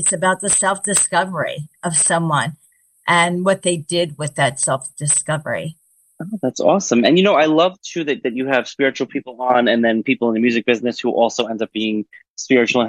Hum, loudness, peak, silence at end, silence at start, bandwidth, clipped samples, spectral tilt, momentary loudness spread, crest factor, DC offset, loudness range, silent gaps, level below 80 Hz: none; -17 LUFS; -2 dBFS; 0 s; 0 s; 12.5 kHz; under 0.1%; -3.5 dB/octave; 11 LU; 16 dB; under 0.1%; 2 LU; 12.29-12.36 s; -62 dBFS